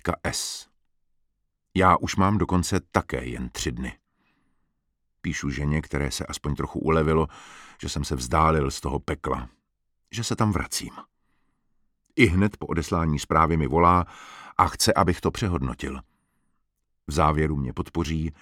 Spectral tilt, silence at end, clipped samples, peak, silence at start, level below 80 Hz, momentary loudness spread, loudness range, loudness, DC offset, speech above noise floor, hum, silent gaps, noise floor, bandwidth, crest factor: -5 dB/octave; 0.1 s; under 0.1%; -2 dBFS; 0.05 s; -38 dBFS; 14 LU; 8 LU; -25 LUFS; under 0.1%; 50 dB; none; none; -74 dBFS; 16.5 kHz; 24 dB